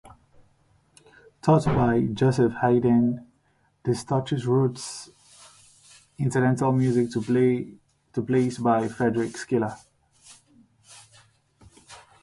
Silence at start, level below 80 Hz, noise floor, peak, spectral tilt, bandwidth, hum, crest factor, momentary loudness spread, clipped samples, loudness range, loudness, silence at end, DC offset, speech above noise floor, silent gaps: 0.05 s; -54 dBFS; -66 dBFS; -6 dBFS; -7 dB/octave; 11.5 kHz; none; 20 dB; 13 LU; under 0.1%; 6 LU; -24 LUFS; 0.25 s; under 0.1%; 44 dB; none